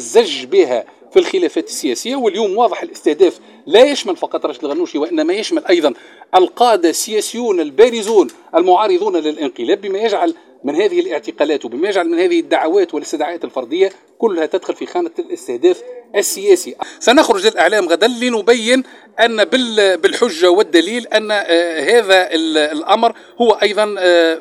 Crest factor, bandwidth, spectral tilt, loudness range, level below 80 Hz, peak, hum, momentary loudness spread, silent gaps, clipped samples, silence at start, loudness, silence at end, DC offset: 14 dB; 16 kHz; -2.5 dB/octave; 4 LU; -62 dBFS; 0 dBFS; none; 9 LU; none; under 0.1%; 0 s; -15 LUFS; 0 s; under 0.1%